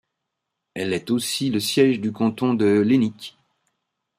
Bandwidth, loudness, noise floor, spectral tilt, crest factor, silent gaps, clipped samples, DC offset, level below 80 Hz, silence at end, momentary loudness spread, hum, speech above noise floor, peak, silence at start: 16 kHz; -21 LUFS; -81 dBFS; -5 dB/octave; 16 dB; none; under 0.1%; under 0.1%; -66 dBFS; 0.9 s; 13 LU; none; 60 dB; -6 dBFS; 0.75 s